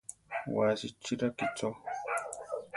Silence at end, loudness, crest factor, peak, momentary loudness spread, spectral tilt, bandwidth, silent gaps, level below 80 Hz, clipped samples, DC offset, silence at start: 0 s; -35 LUFS; 18 dB; -16 dBFS; 9 LU; -4.5 dB/octave; 12 kHz; none; -70 dBFS; under 0.1%; under 0.1%; 0.1 s